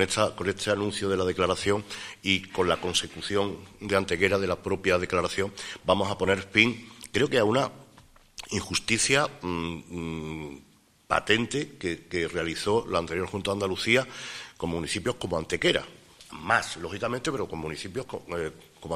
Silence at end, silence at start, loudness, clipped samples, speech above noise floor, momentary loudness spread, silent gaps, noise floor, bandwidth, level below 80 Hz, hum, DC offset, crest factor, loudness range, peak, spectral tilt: 0 s; 0 s; -27 LUFS; under 0.1%; 28 dB; 12 LU; none; -55 dBFS; 15.5 kHz; -54 dBFS; none; under 0.1%; 24 dB; 4 LU; -4 dBFS; -3.5 dB/octave